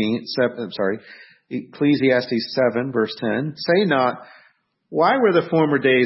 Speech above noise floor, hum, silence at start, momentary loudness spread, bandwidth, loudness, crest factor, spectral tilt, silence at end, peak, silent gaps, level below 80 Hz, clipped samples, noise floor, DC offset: 40 dB; none; 0 s; 12 LU; 6 kHz; -20 LUFS; 16 dB; -9 dB/octave; 0 s; -4 dBFS; none; -68 dBFS; under 0.1%; -59 dBFS; under 0.1%